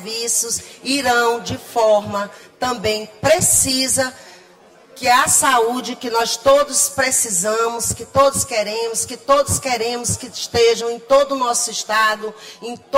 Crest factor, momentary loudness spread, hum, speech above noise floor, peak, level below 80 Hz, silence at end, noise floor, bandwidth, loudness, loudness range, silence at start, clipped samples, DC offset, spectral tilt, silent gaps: 16 dB; 11 LU; none; 29 dB; -2 dBFS; -48 dBFS; 0 s; -47 dBFS; 16 kHz; -17 LUFS; 3 LU; 0 s; under 0.1%; under 0.1%; -2 dB/octave; none